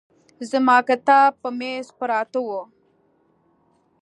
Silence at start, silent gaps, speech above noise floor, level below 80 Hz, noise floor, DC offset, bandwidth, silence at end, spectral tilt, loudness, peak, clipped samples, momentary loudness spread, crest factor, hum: 0.4 s; none; 43 dB; -78 dBFS; -63 dBFS; under 0.1%; 11 kHz; 1.35 s; -3.5 dB/octave; -20 LUFS; -2 dBFS; under 0.1%; 14 LU; 20 dB; none